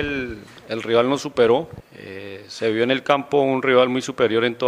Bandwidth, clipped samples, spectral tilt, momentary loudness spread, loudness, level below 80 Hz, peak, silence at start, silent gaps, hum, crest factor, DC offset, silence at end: 11 kHz; under 0.1%; -5 dB/octave; 18 LU; -20 LUFS; -52 dBFS; 0 dBFS; 0 s; none; none; 20 dB; under 0.1%; 0 s